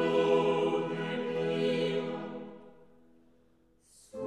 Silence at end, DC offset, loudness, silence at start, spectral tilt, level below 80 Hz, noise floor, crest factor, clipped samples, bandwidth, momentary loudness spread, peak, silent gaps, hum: 0 s; under 0.1%; -31 LUFS; 0 s; -6.5 dB/octave; -76 dBFS; -67 dBFS; 18 dB; under 0.1%; 11 kHz; 17 LU; -16 dBFS; none; none